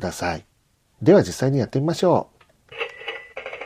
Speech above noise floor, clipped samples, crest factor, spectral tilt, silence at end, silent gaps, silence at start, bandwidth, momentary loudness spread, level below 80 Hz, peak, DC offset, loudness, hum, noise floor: 45 dB; under 0.1%; 18 dB; -6.5 dB/octave; 0 s; none; 0 s; 15.5 kHz; 18 LU; -54 dBFS; -4 dBFS; under 0.1%; -21 LUFS; none; -64 dBFS